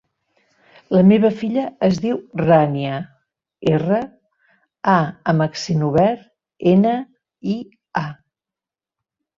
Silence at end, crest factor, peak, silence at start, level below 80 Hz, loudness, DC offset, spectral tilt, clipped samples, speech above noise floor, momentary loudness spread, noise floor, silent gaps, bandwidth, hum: 1.25 s; 18 dB; -2 dBFS; 0.9 s; -54 dBFS; -18 LUFS; under 0.1%; -7.5 dB/octave; under 0.1%; 71 dB; 13 LU; -89 dBFS; none; 7.4 kHz; none